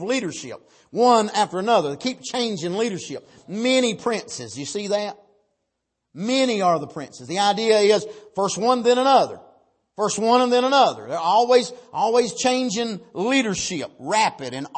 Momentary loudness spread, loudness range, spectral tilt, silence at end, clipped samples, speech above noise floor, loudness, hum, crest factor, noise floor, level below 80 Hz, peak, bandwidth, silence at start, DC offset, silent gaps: 14 LU; 6 LU; -3.5 dB/octave; 0 s; under 0.1%; 57 dB; -21 LUFS; none; 18 dB; -78 dBFS; -66 dBFS; -4 dBFS; 8.8 kHz; 0 s; under 0.1%; none